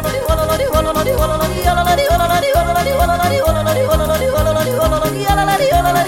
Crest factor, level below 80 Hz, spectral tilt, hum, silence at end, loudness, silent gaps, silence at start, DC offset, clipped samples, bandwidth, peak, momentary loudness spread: 14 dB; -24 dBFS; -5 dB/octave; none; 0 s; -14 LUFS; none; 0 s; under 0.1%; under 0.1%; 17 kHz; 0 dBFS; 3 LU